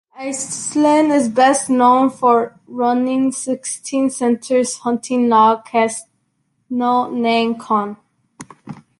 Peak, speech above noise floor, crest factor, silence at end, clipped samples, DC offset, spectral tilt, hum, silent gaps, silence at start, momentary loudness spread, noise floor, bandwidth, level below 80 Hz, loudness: -2 dBFS; 50 dB; 16 dB; 0.25 s; under 0.1%; under 0.1%; -3.5 dB/octave; none; none; 0.15 s; 11 LU; -67 dBFS; 11.5 kHz; -64 dBFS; -16 LUFS